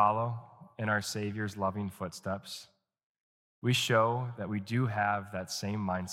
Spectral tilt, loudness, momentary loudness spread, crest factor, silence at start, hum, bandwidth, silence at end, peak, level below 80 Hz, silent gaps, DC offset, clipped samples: -5 dB/octave; -33 LUFS; 12 LU; 22 dB; 0 s; none; 16 kHz; 0 s; -12 dBFS; -70 dBFS; 3.03-3.62 s; under 0.1%; under 0.1%